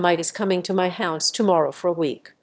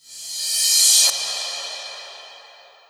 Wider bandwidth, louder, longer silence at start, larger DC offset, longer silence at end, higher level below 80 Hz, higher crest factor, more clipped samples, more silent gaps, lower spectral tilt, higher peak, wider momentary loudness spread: second, 8 kHz vs over 20 kHz; second, -22 LUFS vs -16 LUFS; about the same, 0 s vs 0.1 s; neither; second, 0.15 s vs 0.5 s; first, -72 dBFS vs -80 dBFS; about the same, 18 dB vs 20 dB; neither; neither; first, -4 dB/octave vs 5.5 dB/octave; about the same, -4 dBFS vs -2 dBFS; second, 4 LU vs 21 LU